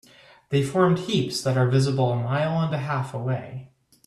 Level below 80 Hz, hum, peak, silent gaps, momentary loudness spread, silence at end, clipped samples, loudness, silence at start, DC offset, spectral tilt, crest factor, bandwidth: -60 dBFS; none; -6 dBFS; none; 8 LU; 0.4 s; under 0.1%; -24 LUFS; 0.5 s; under 0.1%; -6.5 dB/octave; 18 dB; 13 kHz